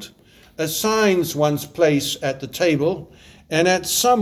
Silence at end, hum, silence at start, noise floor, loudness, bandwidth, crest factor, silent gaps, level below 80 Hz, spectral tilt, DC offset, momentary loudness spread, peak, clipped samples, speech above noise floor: 0 s; none; 0 s; -50 dBFS; -20 LUFS; over 20 kHz; 16 dB; none; -54 dBFS; -4 dB/octave; under 0.1%; 8 LU; -4 dBFS; under 0.1%; 30 dB